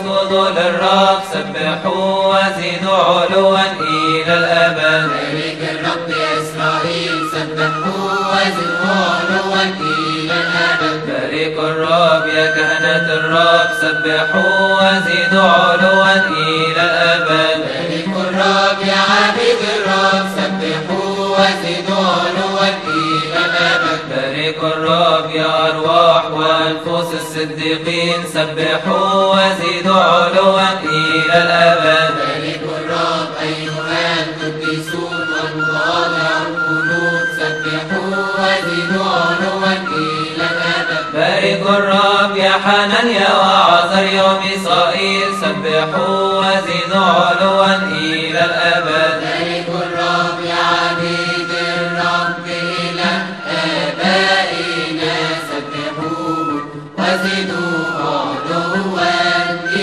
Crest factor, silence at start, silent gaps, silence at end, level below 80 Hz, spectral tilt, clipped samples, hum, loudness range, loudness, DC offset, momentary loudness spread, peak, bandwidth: 14 dB; 0 s; none; 0 s; -56 dBFS; -4.5 dB/octave; under 0.1%; none; 5 LU; -14 LUFS; 0.2%; 8 LU; 0 dBFS; 13 kHz